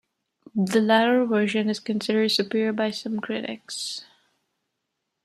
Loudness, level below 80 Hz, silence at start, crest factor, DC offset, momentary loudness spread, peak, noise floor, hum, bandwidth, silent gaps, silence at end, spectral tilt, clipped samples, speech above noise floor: -24 LUFS; -74 dBFS; 0.55 s; 18 dB; under 0.1%; 12 LU; -6 dBFS; -80 dBFS; none; 13.5 kHz; none; 1.2 s; -4.5 dB/octave; under 0.1%; 57 dB